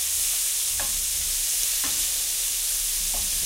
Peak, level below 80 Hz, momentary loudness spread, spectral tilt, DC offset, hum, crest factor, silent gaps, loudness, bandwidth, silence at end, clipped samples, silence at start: -8 dBFS; -44 dBFS; 1 LU; 1.5 dB/octave; under 0.1%; none; 18 dB; none; -22 LUFS; 16 kHz; 0 s; under 0.1%; 0 s